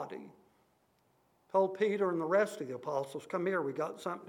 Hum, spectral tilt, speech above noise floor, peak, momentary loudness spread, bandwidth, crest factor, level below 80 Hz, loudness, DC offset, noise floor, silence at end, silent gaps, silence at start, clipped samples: none; -6 dB/octave; 39 dB; -18 dBFS; 9 LU; 17.5 kHz; 18 dB; -88 dBFS; -34 LUFS; under 0.1%; -72 dBFS; 0 s; none; 0 s; under 0.1%